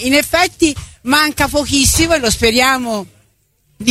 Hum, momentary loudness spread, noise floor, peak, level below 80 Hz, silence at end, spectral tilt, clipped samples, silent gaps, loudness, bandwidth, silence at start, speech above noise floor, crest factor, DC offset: none; 9 LU; -58 dBFS; 0 dBFS; -30 dBFS; 0 s; -2.5 dB/octave; under 0.1%; none; -13 LUFS; 16 kHz; 0 s; 44 dB; 14 dB; under 0.1%